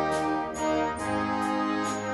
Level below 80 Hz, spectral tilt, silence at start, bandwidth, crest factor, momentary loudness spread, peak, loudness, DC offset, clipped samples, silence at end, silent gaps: -52 dBFS; -4.5 dB/octave; 0 s; 11.5 kHz; 14 dB; 2 LU; -14 dBFS; -28 LUFS; under 0.1%; under 0.1%; 0 s; none